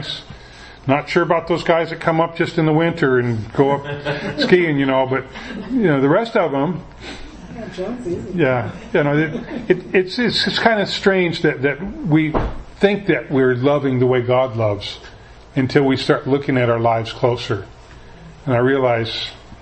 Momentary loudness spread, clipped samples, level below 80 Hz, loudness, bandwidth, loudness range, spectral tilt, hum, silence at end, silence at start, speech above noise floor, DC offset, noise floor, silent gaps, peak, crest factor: 12 LU; under 0.1%; -40 dBFS; -18 LUFS; 8.6 kHz; 3 LU; -6.5 dB/octave; none; 0.05 s; 0 s; 22 dB; under 0.1%; -40 dBFS; none; 0 dBFS; 18 dB